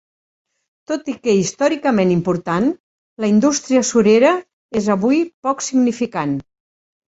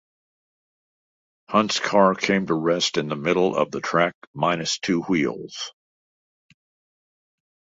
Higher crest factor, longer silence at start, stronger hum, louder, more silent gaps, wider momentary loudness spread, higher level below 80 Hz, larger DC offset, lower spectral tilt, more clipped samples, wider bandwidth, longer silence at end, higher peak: second, 16 dB vs 22 dB; second, 0.9 s vs 1.5 s; neither; first, -17 LUFS vs -22 LUFS; first, 2.80-3.16 s, 4.53-4.69 s, 5.34-5.42 s vs 4.14-4.34 s; about the same, 10 LU vs 8 LU; first, -56 dBFS vs -62 dBFS; neither; about the same, -5 dB/octave vs -4.5 dB/octave; neither; about the same, 8 kHz vs 8 kHz; second, 0.7 s vs 2.05 s; about the same, -2 dBFS vs -2 dBFS